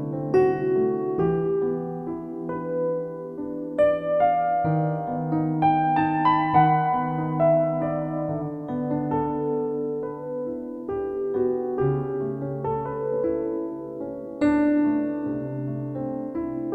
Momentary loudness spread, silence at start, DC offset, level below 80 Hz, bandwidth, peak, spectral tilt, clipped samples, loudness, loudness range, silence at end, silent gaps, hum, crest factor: 11 LU; 0 s; under 0.1%; -54 dBFS; 7.6 kHz; -6 dBFS; -10 dB/octave; under 0.1%; -25 LUFS; 6 LU; 0 s; none; none; 18 dB